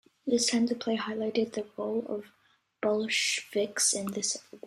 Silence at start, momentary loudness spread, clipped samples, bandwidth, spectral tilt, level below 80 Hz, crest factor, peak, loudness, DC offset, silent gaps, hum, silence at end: 0.25 s; 8 LU; under 0.1%; 14 kHz; -2 dB/octave; -76 dBFS; 20 dB; -12 dBFS; -29 LUFS; under 0.1%; none; none; 0 s